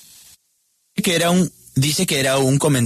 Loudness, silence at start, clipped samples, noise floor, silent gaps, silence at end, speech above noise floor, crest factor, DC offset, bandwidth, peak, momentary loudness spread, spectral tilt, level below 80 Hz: -18 LUFS; 0.95 s; under 0.1%; -66 dBFS; none; 0 s; 49 dB; 12 dB; under 0.1%; 14 kHz; -6 dBFS; 6 LU; -4.5 dB/octave; -52 dBFS